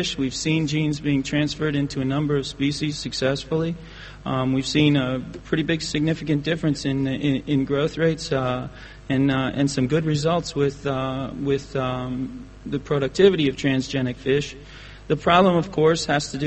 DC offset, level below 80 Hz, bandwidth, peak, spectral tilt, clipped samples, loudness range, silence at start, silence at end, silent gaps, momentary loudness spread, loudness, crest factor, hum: under 0.1%; -44 dBFS; 8.8 kHz; -2 dBFS; -5.5 dB/octave; under 0.1%; 3 LU; 0 s; 0 s; none; 11 LU; -23 LUFS; 20 dB; none